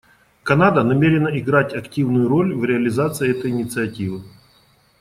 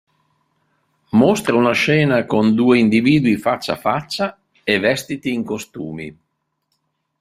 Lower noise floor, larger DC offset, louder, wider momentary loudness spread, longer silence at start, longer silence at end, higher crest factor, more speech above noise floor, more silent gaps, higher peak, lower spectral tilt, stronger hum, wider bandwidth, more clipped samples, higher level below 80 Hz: second, -56 dBFS vs -72 dBFS; neither; about the same, -19 LUFS vs -17 LUFS; second, 10 LU vs 13 LU; second, 0.45 s vs 1.15 s; second, 0.7 s vs 1.1 s; about the same, 16 dB vs 16 dB; second, 38 dB vs 56 dB; neither; about the same, -2 dBFS vs -2 dBFS; about the same, -7 dB/octave vs -6 dB/octave; neither; about the same, 15.5 kHz vs 15 kHz; neither; about the same, -52 dBFS vs -54 dBFS